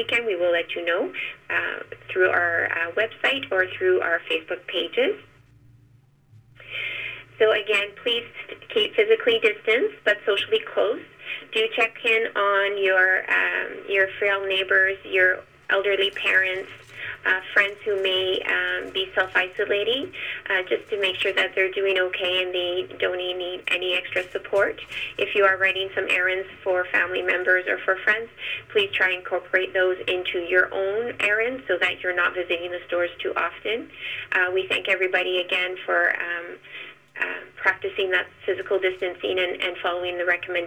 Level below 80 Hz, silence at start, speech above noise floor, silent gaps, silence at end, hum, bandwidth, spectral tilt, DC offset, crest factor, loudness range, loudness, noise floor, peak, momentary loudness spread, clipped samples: -64 dBFS; 0 s; 33 dB; none; 0 s; none; over 20 kHz; -3.5 dB/octave; under 0.1%; 18 dB; 4 LU; -23 LUFS; -56 dBFS; -6 dBFS; 9 LU; under 0.1%